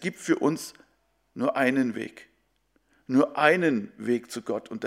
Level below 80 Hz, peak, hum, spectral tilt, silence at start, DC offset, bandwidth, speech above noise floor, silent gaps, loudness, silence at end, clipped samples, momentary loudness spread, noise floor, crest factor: -74 dBFS; -6 dBFS; none; -5.5 dB/octave; 0 s; under 0.1%; 15.5 kHz; 44 dB; none; -26 LUFS; 0 s; under 0.1%; 15 LU; -70 dBFS; 22 dB